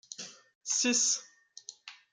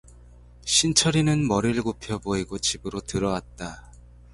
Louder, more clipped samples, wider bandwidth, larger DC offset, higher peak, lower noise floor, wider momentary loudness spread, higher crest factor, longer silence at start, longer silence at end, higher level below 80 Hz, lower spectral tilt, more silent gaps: second, -28 LUFS vs -24 LUFS; neither; about the same, 11 kHz vs 11.5 kHz; neither; second, -16 dBFS vs -6 dBFS; about the same, -52 dBFS vs -49 dBFS; first, 23 LU vs 16 LU; about the same, 18 dB vs 20 dB; about the same, 0.1 s vs 0.15 s; second, 0.2 s vs 0.45 s; second, -88 dBFS vs -46 dBFS; second, 0.5 dB/octave vs -3.5 dB/octave; first, 0.55-0.61 s vs none